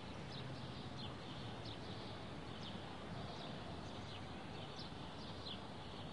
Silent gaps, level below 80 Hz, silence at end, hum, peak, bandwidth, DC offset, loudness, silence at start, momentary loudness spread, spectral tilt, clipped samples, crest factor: none; -64 dBFS; 0 s; none; -34 dBFS; 11.5 kHz; 0.1%; -50 LUFS; 0 s; 2 LU; -5.5 dB/octave; under 0.1%; 16 dB